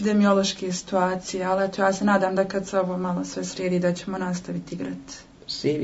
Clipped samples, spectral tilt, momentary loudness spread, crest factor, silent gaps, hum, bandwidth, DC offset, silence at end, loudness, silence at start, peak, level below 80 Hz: under 0.1%; -5 dB/octave; 12 LU; 18 dB; none; none; 8 kHz; under 0.1%; 0 s; -25 LUFS; 0 s; -8 dBFS; -56 dBFS